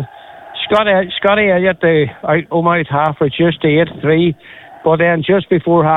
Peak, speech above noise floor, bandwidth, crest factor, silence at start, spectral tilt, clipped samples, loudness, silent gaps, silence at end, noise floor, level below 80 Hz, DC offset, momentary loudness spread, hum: -2 dBFS; 22 dB; 4.1 kHz; 12 dB; 0 s; -8.5 dB/octave; under 0.1%; -13 LUFS; none; 0 s; -35 dBFS; -46 dBFS; under 0.1%; 5 LU; none